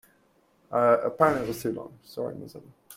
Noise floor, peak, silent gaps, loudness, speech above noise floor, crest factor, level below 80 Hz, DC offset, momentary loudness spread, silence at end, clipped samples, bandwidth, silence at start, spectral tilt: -65 dBFS; -4 dBFS; none; -26 LUFS; 38 dB; 24 dB; -62 dBFS; under 0.1%; 18 LU; 0 s; under 0.1%; 16.5 kHz; 0.7 s; -6 dB/octave